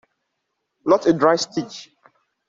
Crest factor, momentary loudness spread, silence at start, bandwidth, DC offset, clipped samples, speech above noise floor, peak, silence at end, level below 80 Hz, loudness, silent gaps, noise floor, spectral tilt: 20 dB; 17 LU; 0.85 s; 7.8 kHz; under 0.1%; under 0.1%; 58 dB; -2 dBFS; 0.65 s; -62 dBFS; -19 LUFS; none; -76 dBFS; -5 dB/octave